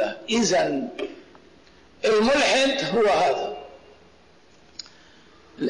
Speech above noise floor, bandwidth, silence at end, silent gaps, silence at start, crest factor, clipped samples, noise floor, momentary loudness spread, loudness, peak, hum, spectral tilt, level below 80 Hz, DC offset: 34 dB; 11 kHz; 0 s; none; 0 s; 12 dB; under 0.1%; -55 dBFS; 22 LU; -22 LUFS; -14 dBFS; none; -3 dB/octave; -56 dBFS; under 0.1%